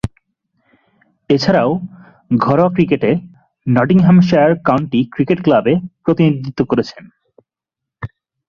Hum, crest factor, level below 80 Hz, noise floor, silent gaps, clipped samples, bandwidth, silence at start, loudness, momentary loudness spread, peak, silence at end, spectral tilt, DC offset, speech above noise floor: none; 14 dB; -46 dBFS; -83 dBFS; none; under 0.1%; 6.8 kHz; 0.05 s; -14 LUFS; 17 LU; -2 dBFS; 0.4 s; -8.5 dB/octave; under 0.1%; 70 dB